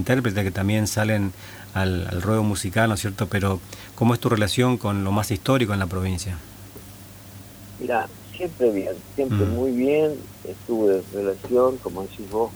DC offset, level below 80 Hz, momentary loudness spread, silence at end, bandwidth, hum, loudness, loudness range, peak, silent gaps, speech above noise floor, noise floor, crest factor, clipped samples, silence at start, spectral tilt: under 0.1%; -48 dBFS; 18 LU; 0 s; over 20 kHz; none; -23 LUFS; 5 LU; -4 dBFS; none; 19 dB; -42 dBFS; 18 dB; under 0.1%; 0 s; -6 dB/octave